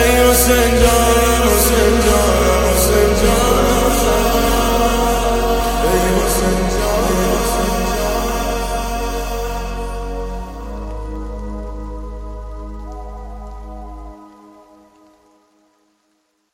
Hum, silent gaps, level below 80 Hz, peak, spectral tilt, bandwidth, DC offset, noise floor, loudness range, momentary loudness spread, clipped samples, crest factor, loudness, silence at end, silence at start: none; none; -22 dBFS; 0 dBFS; -4 dB/octave; 17 kHz; under 0.1%; -64 dBFS; 20 LU; 20 LU; under 0.1%; 16 dB; -15 LUFS; 2.25 s; 0 s